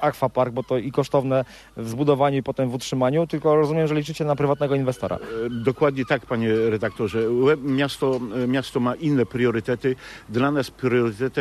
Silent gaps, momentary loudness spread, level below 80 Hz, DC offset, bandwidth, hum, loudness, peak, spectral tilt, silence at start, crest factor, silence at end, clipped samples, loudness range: none; 6 LU; -54 dBFS; under 0.1%; 13.5 kHz; none; -23 LUFS; -6 dBFS; -7 dB/octave; 0 s; 16 dB; 0 s; under 0.1%; 1 LU